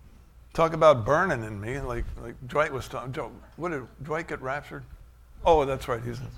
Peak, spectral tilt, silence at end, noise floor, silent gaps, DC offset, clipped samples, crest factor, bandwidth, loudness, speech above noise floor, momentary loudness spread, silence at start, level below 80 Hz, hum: -6 dBFS; -6 dB/octave; 0 s; -51 dBFS; none; under 0.1%; under 0.1%; 22 dB; 16 kHz; -27 LUFS; 25 dB; 16 LU; 0.05 s; -44 dBFS; none